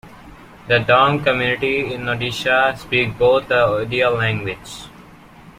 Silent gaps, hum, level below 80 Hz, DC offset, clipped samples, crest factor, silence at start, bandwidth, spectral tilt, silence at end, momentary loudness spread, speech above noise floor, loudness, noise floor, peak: none; none; -46 dBFS; under 0.1%; under 0.1%; 18 dB; 0.05 s; 15.5 kHz; -5.5 dB/octave; 0.1 s; 10 LU; 25 dB; -17 LUFS; -43 dBFS; -2 dBFS